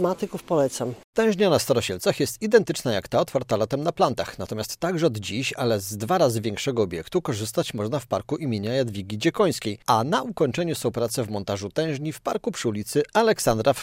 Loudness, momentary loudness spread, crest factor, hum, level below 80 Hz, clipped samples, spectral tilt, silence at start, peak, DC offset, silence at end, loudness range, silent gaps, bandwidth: -24 LUFS; 7 LU; 20 dB; none; -56 dBFS; under 0.1%; -5 dB/octave; 0 s; -4 dBFS; under 0.1%; 0 s; 3 LU; 1.04-1.13 s; 16 kHz